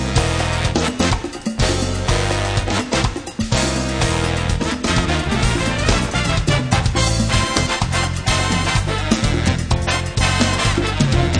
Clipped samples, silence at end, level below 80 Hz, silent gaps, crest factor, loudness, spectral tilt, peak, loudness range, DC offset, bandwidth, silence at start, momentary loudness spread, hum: under 0.1%; 0 s; -26 dBFS; none; 18 dB; -18 LUFS; -4.5 dB/octave; 0 dBFS; 2 LU; under 0.1%; 10.5 kHz; 0 s; 3 LU; none